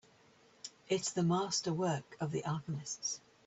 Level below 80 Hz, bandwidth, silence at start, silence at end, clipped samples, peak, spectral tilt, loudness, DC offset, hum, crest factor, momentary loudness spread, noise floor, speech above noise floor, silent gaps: -74 dBFS; 8.2 kHz; 0.65 s; 0.3 s; under 0.1%; -20 dBFS; -4.5 dB/octave; -36 LUFS; under 0.1%; none; 16 dB; 11 LU; -65 dBFS; 29 dB; none